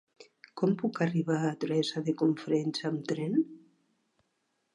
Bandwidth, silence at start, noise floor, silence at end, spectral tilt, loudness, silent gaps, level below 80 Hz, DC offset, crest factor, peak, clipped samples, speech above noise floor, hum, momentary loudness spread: 11 kHz; 0.2 s; -78 dBFS; 1.2 s; -6.5 dB/octave; -31 LUFS; none; -82 dBFS; under 0.1%; 16 dB; -16 dBFS; under 0.1%; 48 dB; none; 4 LU